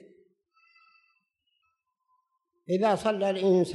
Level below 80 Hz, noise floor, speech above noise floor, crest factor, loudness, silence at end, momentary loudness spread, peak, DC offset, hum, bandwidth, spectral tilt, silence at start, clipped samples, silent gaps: -72 dBFS; -77 dBFS; 53 dB; 16 dB; -26 LUFS; 0 s; 4 LU; -14 dBFS; under 0.1%; none; 12 kHz; -6.5 dB/octave; 2.7 s; under 0.1%; none